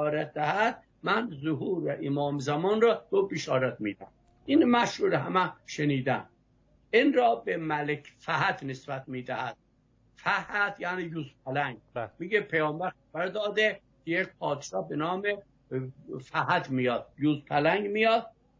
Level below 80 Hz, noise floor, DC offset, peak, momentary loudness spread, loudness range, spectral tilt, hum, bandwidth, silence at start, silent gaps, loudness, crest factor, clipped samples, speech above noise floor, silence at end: -68 dBFS; -66 dBFS; under 0.1%; -12 dBFS; 12 LU; 5 LU; -6 dB/octave; none; 7.6 kHz; 0 s; none; -29 LUFS; 18 dB; under 0.1%; 37 dB; 0.3 s